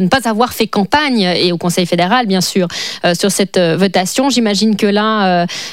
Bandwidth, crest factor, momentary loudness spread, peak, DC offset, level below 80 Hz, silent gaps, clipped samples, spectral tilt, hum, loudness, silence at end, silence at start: 16 kHz; 12 dB; 3 LU; 0 dBFS; 0.6%; -50 dBFS; none; under 0.1%; -4.5 dB/octave; none; -13 LUFS; 0 s; 0 s